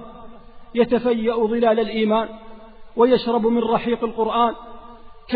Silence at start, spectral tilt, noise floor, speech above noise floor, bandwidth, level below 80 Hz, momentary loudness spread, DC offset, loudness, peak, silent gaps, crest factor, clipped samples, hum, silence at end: 0 s; -4 dB/octave; -40 dBFS; 21 dB; 4.9 kHz; -48 dBFS; 14 LU; under 0.1%; -20 LUFS; -4 dBFS; none; 16 dB; under 0.1%; none; 0 s